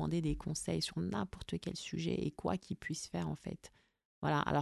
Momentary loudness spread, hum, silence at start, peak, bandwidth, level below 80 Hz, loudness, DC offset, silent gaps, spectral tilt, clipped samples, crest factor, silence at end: 6 LU; none; 0 s; -20 dBFS; 12 kHz; -54 dBFS; -39 LUFS; under 0.1%; 4.05-4.22 s; -5.5 dB/octave; under 0.1%; 18 dB; 0 s